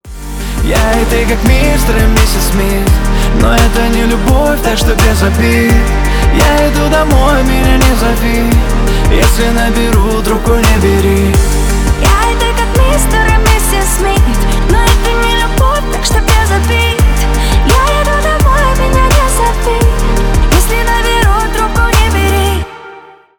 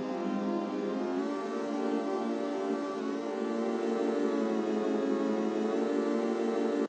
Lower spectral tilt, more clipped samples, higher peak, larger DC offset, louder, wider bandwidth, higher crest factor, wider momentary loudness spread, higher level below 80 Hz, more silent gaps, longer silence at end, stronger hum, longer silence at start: about the same, -5 dB/octave vs -6 dB/octave; first, 0.1% vs under 0.1%; first, 0 dBFS vs -18 dBFS; neither; first, -10 LUFS vs -32 LUFS; first, 20 kHz vs 9.2 kHz; about the same, 8 dB vs 12 dB; about the same, 3 LU vs 4 LU; first, -12 dBFS vs under -90 dBFS; neither; first, 0.4 s vs 0 s; neither; about the same, 0.05 s vs 0 s